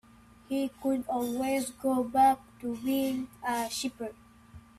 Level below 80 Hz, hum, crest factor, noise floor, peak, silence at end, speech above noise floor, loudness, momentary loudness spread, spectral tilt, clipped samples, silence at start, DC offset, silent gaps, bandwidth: -62 dBFS; none; 18 dB; -53 dBFS; -14 dBFS; 0.2 s; 24 dB; -30 LUFS; 11 LU; -3.5 dB/octave; under 0.1%; 0.5 s; under 0.1%; none; 15 kHz